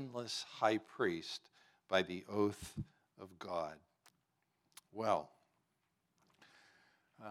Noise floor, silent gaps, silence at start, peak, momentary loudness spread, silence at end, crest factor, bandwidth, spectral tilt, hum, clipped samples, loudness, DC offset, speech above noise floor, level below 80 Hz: -83 dBFS; none; 0 s; -18 dBFS; 19 LU; 0 s; 24 dB; 16 kHz; -4.5 dB/octave; none; under 0.1%; -40 LUFS; under 0.1%; 44 dB; -74 dBFS